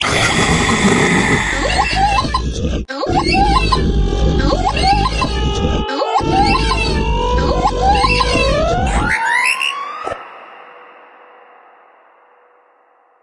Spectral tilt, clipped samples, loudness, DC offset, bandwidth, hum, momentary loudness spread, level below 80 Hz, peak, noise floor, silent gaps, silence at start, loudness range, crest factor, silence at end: -4.5 dB/octave; under 0.1%; -15 LUFS; under 0.1%; 11.5 kHz; none; 7 LU; -22 dBFS; 0 dBFS; -53 dBFS; none; 0 s; 5 LU; 14 dB; 2.35 s